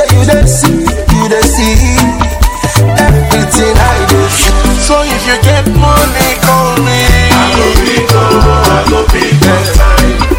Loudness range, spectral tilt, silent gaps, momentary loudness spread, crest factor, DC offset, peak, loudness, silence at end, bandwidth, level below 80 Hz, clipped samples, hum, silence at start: 1 LU; -4.5 dB/octave; none; 3 LU; 6 dB; under 0.1%; 0 dBFS; -8 LUFS; 0 s; over 20 kHz; -12 dBFS; 6%; none; 0 s